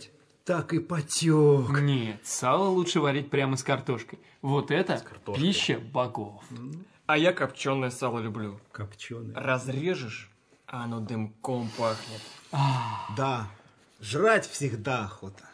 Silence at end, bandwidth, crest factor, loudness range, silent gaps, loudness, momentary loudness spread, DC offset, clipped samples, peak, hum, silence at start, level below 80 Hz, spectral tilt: 0 s; 11 kHz; 20 dB; 7 LU; none; -28 LUFS; 17 LU; under 0.1%; under 0.1%; -8 dBFS; none; 0 s; -72 dBFS; -5 dB/octave